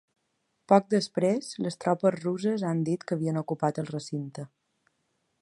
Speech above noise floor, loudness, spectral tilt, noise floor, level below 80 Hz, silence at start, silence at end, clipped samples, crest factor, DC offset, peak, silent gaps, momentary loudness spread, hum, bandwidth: 49 dB; -28 LUFS; -6.5 dB/octave; -77 dBFS; -76 dBFS; 0.7 s; 0.95 s; under 0.1%; 24 dB; under 0.1%; -6 dBFS; none; 12 LU; none; 11.5 kHz